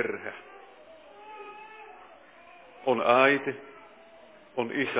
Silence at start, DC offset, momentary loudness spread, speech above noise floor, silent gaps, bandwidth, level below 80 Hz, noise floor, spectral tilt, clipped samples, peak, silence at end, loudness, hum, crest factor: 0 s; under 0.1%; 28 LU; 28 dB; none; 4 kHz; -78 dBFS; -53 dBFS; -8 dB/octave; under 0.1%; -6 dBFS; 0 s; -26 LUFS; none; 24 dB